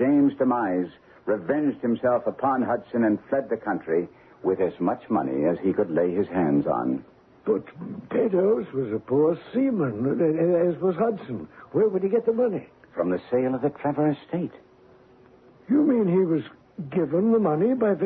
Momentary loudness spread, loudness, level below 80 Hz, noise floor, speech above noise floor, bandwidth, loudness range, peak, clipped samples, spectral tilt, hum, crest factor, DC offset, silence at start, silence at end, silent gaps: 9 LU; -24 LUFS; -64 dBFS; -54 dBFS; 30 dB; 4.3 kHz; 2 LU; -10 dBFS; under 0.1%; -11.5 dB/octave; none; 14 dB; under 0.1%; 0 s; 0 s; none